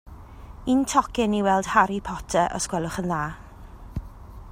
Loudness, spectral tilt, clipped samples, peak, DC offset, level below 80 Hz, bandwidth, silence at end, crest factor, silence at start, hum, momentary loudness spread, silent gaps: -24 LUFS; -4.5 dB/octave; under 0.1%; -4 dBFS; under 0.1%; -42 dBFS; 16 kHz; 0 s; 22 dB; 0.05 s; none; 23 LU; none